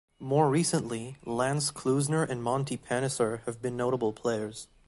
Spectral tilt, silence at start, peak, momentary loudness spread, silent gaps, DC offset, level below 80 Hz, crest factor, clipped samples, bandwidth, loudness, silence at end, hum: -5 dB/octave; 0.2 s; -10 dBFS; 9 LU; none; under 0.1%; -62 dBFS; 20 dB; under 0.1%; 12 kHz; -30 LUFS; 0.2 s; none